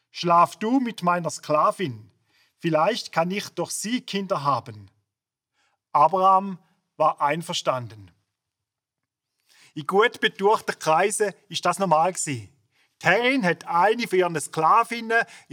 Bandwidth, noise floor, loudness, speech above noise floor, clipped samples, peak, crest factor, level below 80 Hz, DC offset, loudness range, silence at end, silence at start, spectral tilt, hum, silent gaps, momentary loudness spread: 19.5 kHz; -86 dBFS; -23 LUFS; 63 dB; under 0.1%; -2 dBFS; 22 dB; -80 dBFS; under 0.1%; 5 LU; 0.15 s; 0.15 s; -4 dB/octave; none; none; 10 LU